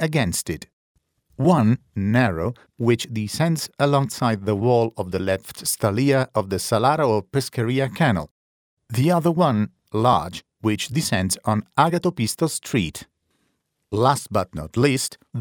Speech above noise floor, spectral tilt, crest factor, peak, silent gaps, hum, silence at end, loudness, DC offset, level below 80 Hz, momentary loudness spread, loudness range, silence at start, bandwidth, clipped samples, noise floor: 51 dB; -5.5 dB/octave; 20 dB; -2 dBFS; 0.73-0.95 s, 8.31-8.77 s; none; 0 s; -22 LUFS; under 0.1%; -50 dBFS; 8 LU; 2 LU; 0 s; 20 kHz; under 0.1%; -72 dBFS